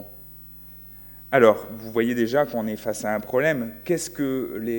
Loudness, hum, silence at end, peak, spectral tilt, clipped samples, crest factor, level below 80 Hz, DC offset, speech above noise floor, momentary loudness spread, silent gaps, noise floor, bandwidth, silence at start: -23 LUFS; 60 Hz at -50 dBFS; 0 s; -2 dBFS; -5.5 dB/octave; under 0.1%; 22 dB; -56 dBFS; under 0.1%; 20 dB; 22 LU; none; -43 dBFS; 17 kHz; 0 s